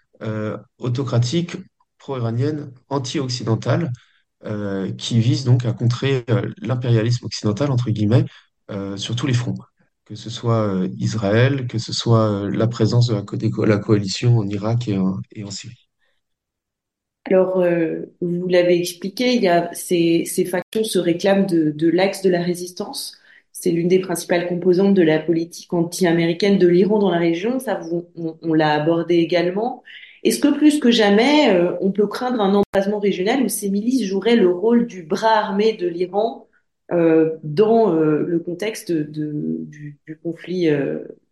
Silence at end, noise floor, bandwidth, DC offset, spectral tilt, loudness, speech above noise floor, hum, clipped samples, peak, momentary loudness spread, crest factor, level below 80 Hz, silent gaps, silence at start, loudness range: 0.25 s; -82 dBFS; 12.5 kHz; under 0.1%; -6 dB/octave; -19 LUFS; 64 dB; none; under 0.1%; -2 dBFS; 13 LU; 16 dB; -60 dBFS; 20.62-20.72 s, 32.66-32.73 s; 0.2 s; 6 LU